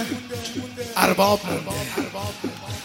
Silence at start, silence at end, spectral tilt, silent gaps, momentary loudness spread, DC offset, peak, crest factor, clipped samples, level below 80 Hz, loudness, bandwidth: 0 s; 0 s; -4 dB/octave; none; 13 LU; under 0.1%; 0 dBFS; 24 dB; under 0.1%; -54 dBFS; -24 LUFS; 16.5 kHz